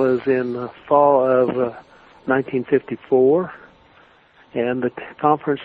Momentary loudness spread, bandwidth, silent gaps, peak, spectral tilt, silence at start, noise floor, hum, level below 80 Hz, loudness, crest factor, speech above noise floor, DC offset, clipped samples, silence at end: 12 LU; 4.7 kHz; none; -2 dBFS; -9.5 dB/octave; 0 s; -52 dBFS; none; -60 dBFS; -19 LUFS; 18 dB; 33 dB; under 0.1%; under 0.1%; 0 s